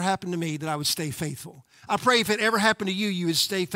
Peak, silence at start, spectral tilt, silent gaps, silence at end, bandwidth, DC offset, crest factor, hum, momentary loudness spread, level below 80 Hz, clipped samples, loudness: -6 dBFS; 0 s; -3.5 dB/octave; none; 0 s; 16 kHz; under 0.1%; 20 dB; none; 11 LU; -64 dBFS; under 0.1%; -24 LUFS